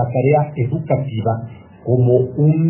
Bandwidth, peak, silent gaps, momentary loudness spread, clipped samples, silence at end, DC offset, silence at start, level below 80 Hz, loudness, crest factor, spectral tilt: 3.2 kHz; -2 dBFS; none; 11 LU; under 0.1%; 0 s; under 0.1%; 0 s; -46 dBFS; -17 LUFS; 14 dB; -13 dB/octave